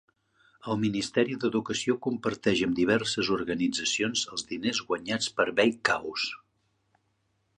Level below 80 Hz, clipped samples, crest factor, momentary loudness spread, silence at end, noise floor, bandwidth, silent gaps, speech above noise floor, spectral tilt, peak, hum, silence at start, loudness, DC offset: -62 dBFS; under 0.1%; 22 dB; 7 LU; 1.2 s; -74 dBFS; 11 kHz; none; 46 dB; -3.5 dB/octave; -8 dBFS; none; 0.65 s; -28 LUFS; under 0.1%